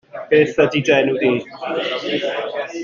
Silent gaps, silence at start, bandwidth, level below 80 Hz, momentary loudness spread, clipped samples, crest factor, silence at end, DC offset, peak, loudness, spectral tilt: none; 0.15 s; 7.2 kHz; -58 dBFS; 9 LU; under 0.1%; 16 dB; 0 s; under 0.1%; -2 dBFS; -18 LUFS; -5.5 dB/octave